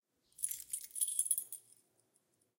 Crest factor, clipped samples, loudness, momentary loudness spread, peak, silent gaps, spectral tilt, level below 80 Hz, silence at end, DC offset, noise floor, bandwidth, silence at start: 26 dB; under 0.1%; -37 LUFS; 13 LU; -18 dBFS; none; 3 dB/octave; -86 dBFS; 1 s; under 0.1%; -78 dBFS; 17 kHz; 0.4 s